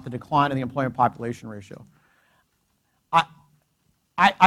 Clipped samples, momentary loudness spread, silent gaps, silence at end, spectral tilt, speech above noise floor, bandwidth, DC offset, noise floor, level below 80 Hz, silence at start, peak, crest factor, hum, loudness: under 0.1%; 19 LU; none; 0 s; -5.5 dB/octave; 47 dB; 14 kHz; under 0.1%; -70 dBFS; -60 dBFS; 0.05 s; 0 dBFS; 24 dB; none; -24 LUFS